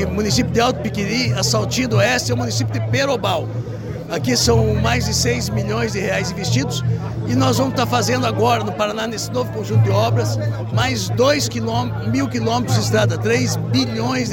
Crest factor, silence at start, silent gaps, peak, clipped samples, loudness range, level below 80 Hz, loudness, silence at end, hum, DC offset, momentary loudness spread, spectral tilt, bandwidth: 14 dB; 0 s; none; -4 dBFS; under 0.1%; 1 LU; -38 dBFS; -18 LUFS; 0 s; none; under 0.1%; 6 LU; -5 dB/octave; 17 kHz